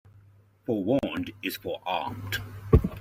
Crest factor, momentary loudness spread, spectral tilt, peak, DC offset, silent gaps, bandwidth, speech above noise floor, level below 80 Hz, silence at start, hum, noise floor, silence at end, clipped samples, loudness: 26 dB; 10 LU; -6.5 dB/octave; -4 dBFS; under 0.1%; none; 16 kHz; 27 dB; -36 dBFS; 0.7 s; none; -57 dBFS; 0 s; under 0.1%; -29 LUFS